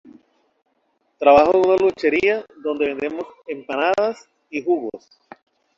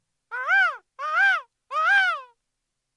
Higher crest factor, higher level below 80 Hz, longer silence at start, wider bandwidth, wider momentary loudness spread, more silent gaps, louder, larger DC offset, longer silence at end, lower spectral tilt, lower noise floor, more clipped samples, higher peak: about the same, 18 dB vs 14 dB; first, -56 dBFS vs -86 dBFS; first, 1.2 s vs 0.3 s; second, 7.6 kHz vs 11 kHz; first, 18 LU vs 14 LU; neither; first, -19 LUFS vs -22 LUFS; neither; about the same, 0.8 s vs 0.7 s; first, -5.5 dB/octave vs 4 dB/octave; second, -68 dBFS vs -80 dBFS; neither; first, -2 dBFS vs -10 dBFS